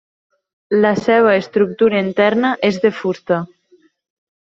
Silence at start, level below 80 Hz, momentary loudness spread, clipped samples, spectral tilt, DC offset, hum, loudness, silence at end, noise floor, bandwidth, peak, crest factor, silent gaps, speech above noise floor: 0.7 s; -60 dBFS; 8 LU; under 0.1%; -6.5 dB/octave; under 0.1%; none; -16 LUFS; 1.1 s; -54 dBFS; 7.6 kHz; 0 dBFS; 16 dB; none; 39 dB